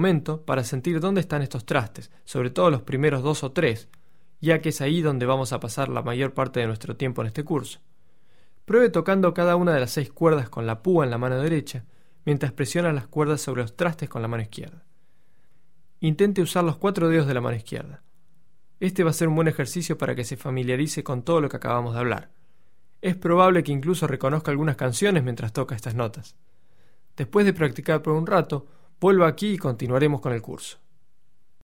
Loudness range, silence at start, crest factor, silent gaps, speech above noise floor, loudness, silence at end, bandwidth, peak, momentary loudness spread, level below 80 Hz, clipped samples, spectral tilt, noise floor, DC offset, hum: 4 LU; 0 s; 20 dB; none; 47 dB; -24 LUFS; 0.95 s; 16.5 kHz; -4 dBFS; 10 LU; -56 dBFS; under 0.1%; -6.5 dB/octave; -71 dBFS; 0.5%; none